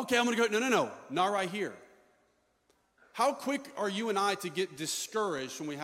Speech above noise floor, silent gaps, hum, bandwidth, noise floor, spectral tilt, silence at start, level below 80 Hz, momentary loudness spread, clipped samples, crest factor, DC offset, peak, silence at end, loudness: 41 dB; none; none; 16.5 kHz; -72 dBFS; -3 dB/octave; 0 s; -78 dBFS; 8 LU; under 0.1%; 20 dB; under 0.1%; -12 dBFS; 0 s; -32 LUFS